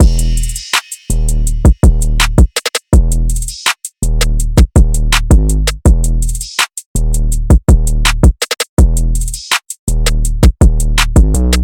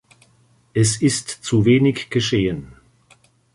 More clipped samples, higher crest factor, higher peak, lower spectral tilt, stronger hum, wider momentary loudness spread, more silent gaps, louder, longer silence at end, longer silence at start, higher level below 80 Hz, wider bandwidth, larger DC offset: neither; second, 10 dB vs 18 dB; first, 0 dBFS vs -4 dBFS; about the same, -4.5 dB/octave vs -5 dB/octave; neither; about the same, 7 LU vs 9 LU; first, 6.86-6.95 s, 8.69-8.77 s, 9.79-9.87 s vs none; first, -13 LUFS vs -19 LUFS; second, 0 s vs 0.85 s; second, 0 s vs 0.75 s; first, -12 dBFS vs -48 dBFS; first, 17 kHz vs 11.5 kHz; first, 0.9% vs under 0.1%